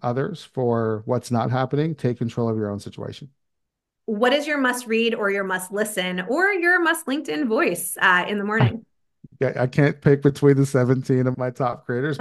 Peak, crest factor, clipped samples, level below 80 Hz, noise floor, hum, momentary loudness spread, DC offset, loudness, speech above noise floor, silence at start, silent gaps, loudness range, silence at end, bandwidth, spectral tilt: -2 dBFS; 20 dB; under 0.1%; -60 dBFS; -79 dBFS; none; 9 LU; under 0.1%; -21 LUFS; 57 dB; 0.05 s; none; 5 LU; 0 s; 12.5 kHz; -5.5 dB/octave